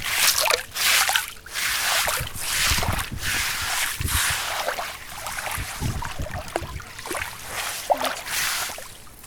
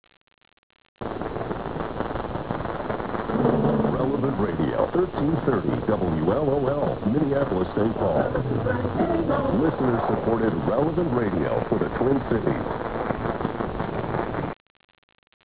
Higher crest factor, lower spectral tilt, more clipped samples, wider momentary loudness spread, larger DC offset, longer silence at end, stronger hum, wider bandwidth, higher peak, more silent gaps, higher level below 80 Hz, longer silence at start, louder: first, 26 dB vs 16 dB; second, -1 dB/octave vs -12 dB/octave; neither; first, 13 LU vs 7 LU; second, under 0.1% vs 0.4%; second, 0 s vs 0.95 s; neither; first, over 20 kHz vs 4 kHz; first, 0 dBFS vs -8 dBFS; neither; about the same, -40 dBFS vs -42 dBFS; second, 0 s vs 1 s; about the same, -23 LUFS vs -25 LUFS